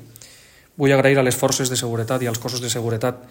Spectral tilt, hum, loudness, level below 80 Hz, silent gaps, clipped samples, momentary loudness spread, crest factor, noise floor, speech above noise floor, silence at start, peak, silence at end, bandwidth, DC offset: -4.5 dB/octave; none; -20 LUFS; -56 dBFS; none; under 0.1%; 8 LU; 18 dB; -49 dBFS; 29 dB; 0 s; -4 dBFS; 0.05 s; 17 kHz; under 0.1%